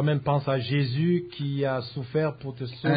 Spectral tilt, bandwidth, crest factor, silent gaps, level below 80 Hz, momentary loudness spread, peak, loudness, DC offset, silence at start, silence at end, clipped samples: -11.5 dB/octave; 5 kHz; 14 dB; none; -60 dBFS; 7 LU; -12 dBFS; -27 LUFS; under 0.1%; 0 s; 0 s; under 0.1%